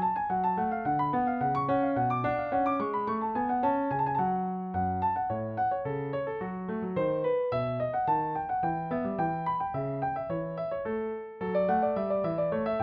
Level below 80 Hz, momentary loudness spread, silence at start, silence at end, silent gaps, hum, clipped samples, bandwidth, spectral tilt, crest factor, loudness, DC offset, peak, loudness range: -60 dBFS; 6 LU; 0 s; 0 s; none; none; under 0.1%; 5 kHz; -10 dB/octave; 14 dB; -30 LUFS; under 0.1%; -16 dBFS; 3 LU